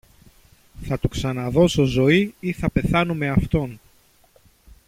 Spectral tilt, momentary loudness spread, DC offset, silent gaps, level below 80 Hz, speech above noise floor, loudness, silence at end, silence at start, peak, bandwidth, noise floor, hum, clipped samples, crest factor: -6.5 dB/octave; 9 LU; under 0.1%; none; -38 dBFS; 36 dB; -21 LUFS; 1.1 s; 0.75 s; -4 dBFS; 16 kHz; -56 dBFS; none; under 0.1%; 18 dB